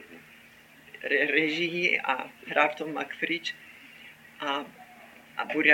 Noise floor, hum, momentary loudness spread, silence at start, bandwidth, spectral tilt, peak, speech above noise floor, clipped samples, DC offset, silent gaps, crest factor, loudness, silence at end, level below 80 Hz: -54 dBFS; none; 24 LU; 0 s; 17 kHz; -4 dB/octave; -6 dBFS; 27 dB; under 0.1%; under 0.1%; none; 24 dB; -28 LUFS; 0 s; -76 dBFS